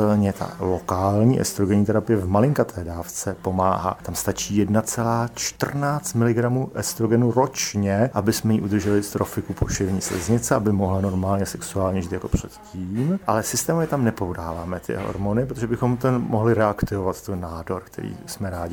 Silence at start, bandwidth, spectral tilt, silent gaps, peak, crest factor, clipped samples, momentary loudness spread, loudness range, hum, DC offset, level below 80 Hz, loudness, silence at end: 0 s; 19.5 kHz; -6 dB/octave; none; -4 dBFS; 18 dB; under 0.1%; 10 LU; 3 LU; none; under 0.1%; -42 dBFS; -23 LUFS; 0 s